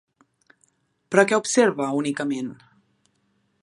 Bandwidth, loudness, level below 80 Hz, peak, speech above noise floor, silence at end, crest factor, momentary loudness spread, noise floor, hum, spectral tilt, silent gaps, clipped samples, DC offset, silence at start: 11.5 kHz; -22 LUFS; -74 dBFS; -2 dBFS; 47 dB; 1.1 s; 24 dB; 10 LU; -68 dBFS; none; -4 dB/octave; none; under 0.1%; under 0.1%; 1.1 s